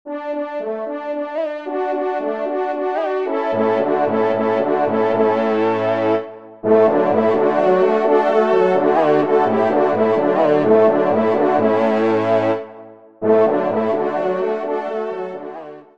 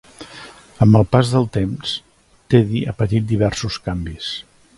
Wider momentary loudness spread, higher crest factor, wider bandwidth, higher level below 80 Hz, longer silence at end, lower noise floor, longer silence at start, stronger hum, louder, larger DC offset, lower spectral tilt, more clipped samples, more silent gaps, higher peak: second, 10 LU vs 17 LU; about the same, 16 dB vs 18 dB; second, 7 kHz vs 11.5 kHz; second, -66 dBFS vs -40 dBFS; second, 0.15 s vs 0.35 s; about the same, -40 dBFS vs -40 dBFS; second, 0.05 s vs 0.2 s; neither; about the same, -17 LUFS vs -18 LUFS; first, 0.4% vs under 0.1%; about the same, -8 dB/octave vs -7 dB/octave; neither; neither; about the same, -2 dBFS vs 0 dBFS